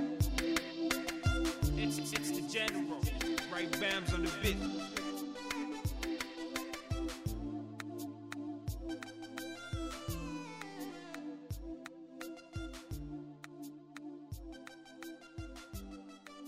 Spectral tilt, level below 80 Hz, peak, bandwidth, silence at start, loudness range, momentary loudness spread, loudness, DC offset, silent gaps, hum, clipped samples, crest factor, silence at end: -4.5 dB/octave; -48 dBFS; -18 dBFS; 16 kHz; 0 s; 13 LU; 15 LU; -39 LUFS; under 0.1%; none; none; under 0.1%; 20 dB; 0 s